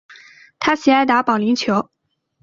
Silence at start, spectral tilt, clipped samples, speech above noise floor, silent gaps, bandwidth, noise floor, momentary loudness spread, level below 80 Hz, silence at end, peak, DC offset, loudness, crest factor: 0.1 s; -4.5 dB/octave; under 0.1%; 29 dB; none; 7.6 kHz; -45 dBFS; 8 LU; -58 dBFS; 0.6 s; -2 dBFS; under 0.1%; -17 LUFS; 16 dB